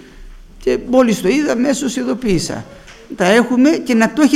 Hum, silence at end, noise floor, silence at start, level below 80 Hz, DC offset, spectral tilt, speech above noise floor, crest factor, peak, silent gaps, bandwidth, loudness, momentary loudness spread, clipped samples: none; 0 s; -36 dBFS; 0.15 s; -40 dBFS; under 0.1%; -5 dB/octave; 22 dB; 16 dB; 0 dBFS; none; 15 kHz; -15 LUFS; 9 LU; under 0.1%